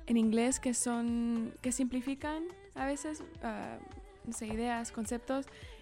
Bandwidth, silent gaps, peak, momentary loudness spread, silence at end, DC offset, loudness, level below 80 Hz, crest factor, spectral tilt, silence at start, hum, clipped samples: 16 kHz; none; -20 dBFS; 13 LU; 0 s; under 0.1%; -35 LUFS; -56 dBFS; 16 dB; -4 dB/octave; 0 s; none; under 0.1%